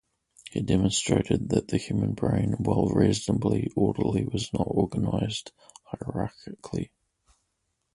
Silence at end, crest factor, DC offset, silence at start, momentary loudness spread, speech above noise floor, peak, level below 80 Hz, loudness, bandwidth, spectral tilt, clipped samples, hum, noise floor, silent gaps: 1.1 s; 20 dB; under 0.1%; 0.45 s; 12 LU; 51 dB; -8 dBFS; -46 dBFS; -27 LUFS; 11.5 kHz; -6 dB/octave; under 0.1%; none; -77 dBFS; none